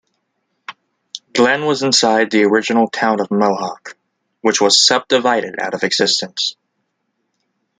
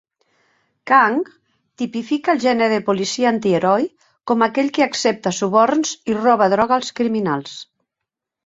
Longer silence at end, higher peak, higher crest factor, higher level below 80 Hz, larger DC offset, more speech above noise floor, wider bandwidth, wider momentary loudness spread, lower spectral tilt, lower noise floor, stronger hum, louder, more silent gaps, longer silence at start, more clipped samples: first, 1.3 s vs 0.85 s; about the same, 0 dBFS vs -2 dBFS; about the same, 16 dB vs 18 dB; about the same, -66 dBFS vs -62 dBFS; neither; second, 55 dB vs 65 dB; first, 9.6 kHz vs 8 kHz; first, 22 LU vs 11 LU; second, -2.5 dB/octave vs -4.5 dB/octave; second, -71 dBFS vs -83 dBFS; neither; first, -15 LUFS vs -18 LUFS; neither; second, 0.7 s vs 0.85 s; neither